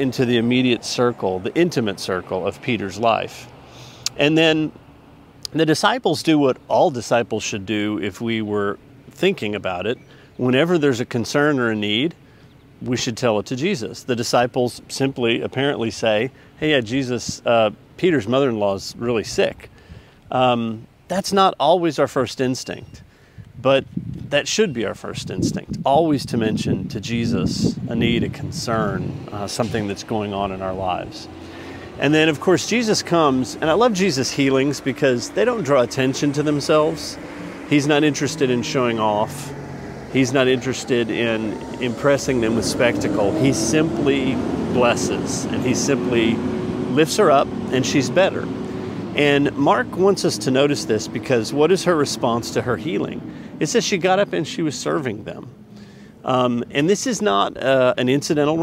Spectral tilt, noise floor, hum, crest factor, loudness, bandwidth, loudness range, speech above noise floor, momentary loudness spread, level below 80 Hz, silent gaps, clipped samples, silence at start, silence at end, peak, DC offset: -5 dB/octave; -47 dBFS; none; 20 dB; -20 LUFS; 16 kHz; 4 LU; 28 dB; 10 LU; -50 dBFS; none; under 0.1%; 0 s; 0 s; 0 dBFS; under 0.1%